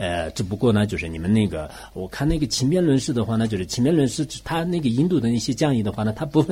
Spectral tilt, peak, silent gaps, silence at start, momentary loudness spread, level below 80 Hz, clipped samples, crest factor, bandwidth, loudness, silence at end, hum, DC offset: -6 dB/octave; -6 dBFS; none; 0 s; 7 LU; -40 dBFS; under 0.1%; 14 dB; 16 kHz; -22 LUFS; 0 s; none; under 0.1%